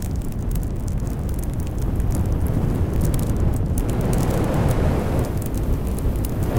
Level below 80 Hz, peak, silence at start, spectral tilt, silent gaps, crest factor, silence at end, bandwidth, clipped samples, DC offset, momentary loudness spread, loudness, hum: -24 dBFS; -6 dBFS; 0 s; -7.5 dB/octave; none; 14 dB; 0 s; 17 kHz; under 0.1%; under 0.1%; 6 LU; -23 LUFS; none